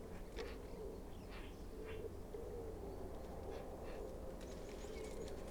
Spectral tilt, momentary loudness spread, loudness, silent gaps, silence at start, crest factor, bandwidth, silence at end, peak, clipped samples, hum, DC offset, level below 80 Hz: -6 dB/octave; 3 LU; -51 LUFS; none; 0 s; 14 dB; over 20 kHz; 0 s; -34 dBFS; under 0.1%; none; under 0.1%; -54 dBFS